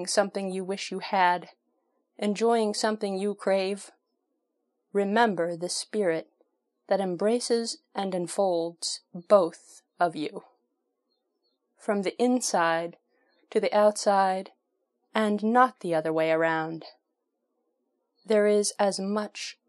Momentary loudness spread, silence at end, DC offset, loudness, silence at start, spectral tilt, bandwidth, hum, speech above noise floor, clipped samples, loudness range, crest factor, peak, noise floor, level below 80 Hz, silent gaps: 10 LU; 0.15 s; under 0.1%; -27 LUFS; 0 s; -4 dB/octave; 12.5 kHz; none; 54 dB; under 0.1%; 4 LU; 22 dB; -6 dBFS; -80 dBFS; -86 dBFS; none